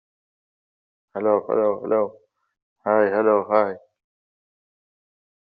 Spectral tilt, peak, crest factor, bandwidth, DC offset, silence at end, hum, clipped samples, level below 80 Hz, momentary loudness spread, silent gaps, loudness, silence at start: -6 dB/octave; -4 dBFS; 20 dB; 4.9 kHz; under 0.1%; 1.7 s; none; under 0.1%; -74 dBFS; 12 LU; 2.62-2.76 s; -21 LUFS; 1.15 s